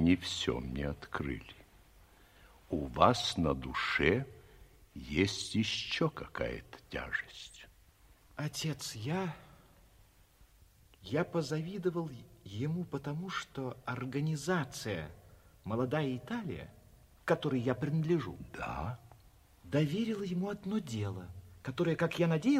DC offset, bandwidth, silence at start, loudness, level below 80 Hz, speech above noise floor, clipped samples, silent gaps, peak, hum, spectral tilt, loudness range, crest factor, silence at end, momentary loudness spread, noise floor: under 0.1%; 15.5 kHz; 0 s; -35 LUFS; -56 dBFS; 29 dB; under 0.1%; none; -10 dBFS; none; -5.5 dB/octave; 7 LU; 26 dB; 0 s; 16 LU; -63 dBFS